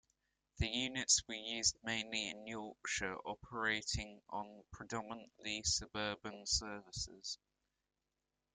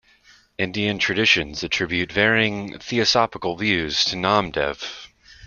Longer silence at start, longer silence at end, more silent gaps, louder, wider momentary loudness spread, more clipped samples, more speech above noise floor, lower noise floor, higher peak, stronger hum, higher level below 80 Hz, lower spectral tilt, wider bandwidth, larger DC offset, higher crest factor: about the same, 0.55 s vs 0.6 s; first, 1.2 s vs 0 s; neither; second, -39 LUFS vs -20 LUFS; about the same, 13 LU vs 11 LU; neither; first, 48 dB vs 33 dB; first, -90 dBFS vs -54 dBFS; second, -18 dBFS vs -2 dBFS; neither; second, -58 dBFS vs -50 dBFS; second, -1.5 dB/octave vs -3.5 dB/octave; first, 12 kHz vs 7.4 kHz; neither; about the same, 24 dB vs 20 dB